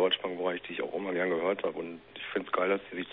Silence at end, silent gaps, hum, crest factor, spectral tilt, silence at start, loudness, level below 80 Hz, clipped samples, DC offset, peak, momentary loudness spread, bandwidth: 0 s; none; none; 18 dB; -8 dB/octave; 0 s; -32 LUFS; -74 dBFS; under 0.1%; under 0.1%; -14 dBFS; 8 LU; 4.1 kHz